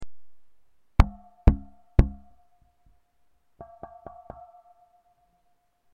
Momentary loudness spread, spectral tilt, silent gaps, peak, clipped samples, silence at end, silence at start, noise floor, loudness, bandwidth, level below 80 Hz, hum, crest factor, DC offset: 23 LU; -8.5 dB/octave; none; -4 dBFS; under 0.1%; 3.8 s; 0 s; -69 dBFS; -26 LUFS; 6.8 kHz; -30 dBFS; none; 24 dB; under 0.1%